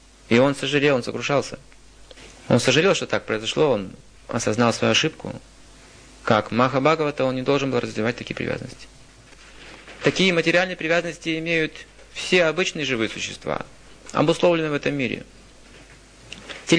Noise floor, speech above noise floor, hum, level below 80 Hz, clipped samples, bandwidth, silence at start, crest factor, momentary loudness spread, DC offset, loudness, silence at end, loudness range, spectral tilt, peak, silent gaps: -47 dBFS; 26 dB; none; -52 dBFS; under 0.1%; 10.5 kHz; 0.3 s; 20 dB; 18 LU; under 0.1%; -21 LUFS; 0 s; 3 LU; -4.5 dB/octave; -4 dBFS; none